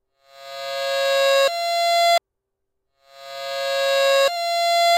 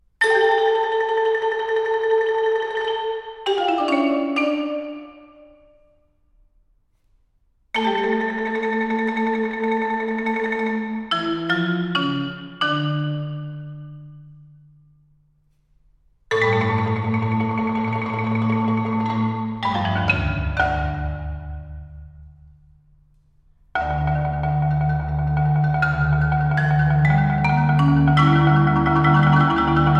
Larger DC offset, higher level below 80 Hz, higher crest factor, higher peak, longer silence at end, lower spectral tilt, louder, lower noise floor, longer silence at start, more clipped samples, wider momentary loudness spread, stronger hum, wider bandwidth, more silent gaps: neither; second, -74 dBFS vs -38 dBFS; about the same, 14 dB vs 18 dB; about the same, -6 dBFS vs -4 dBFS; about the same, 0 s vs 0 s; second, 2 dB/octave vs -7.5 dB/octave; about the same, -19 LUFS vs -20 LUFS; first, -78 dBFS vs -62 dBFS; first, 0.4 s vs 0.2 s; neither; about the same, 14 LU vs 12 LU; neither; first, 16 kHz vs 9.8 kHz; neither